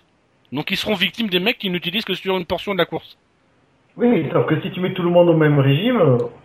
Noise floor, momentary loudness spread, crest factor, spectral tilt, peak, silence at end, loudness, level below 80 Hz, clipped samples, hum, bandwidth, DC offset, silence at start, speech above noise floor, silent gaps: -59 dBFS; 8 LU; 16 dB; -7 dB/octave; -2 dBFS; 0.1 s; -18 LUFS; -54 dBFS; under 0.1%; none; 15.5 kHz; under 0.1%; 0.5 s; 41 dB; none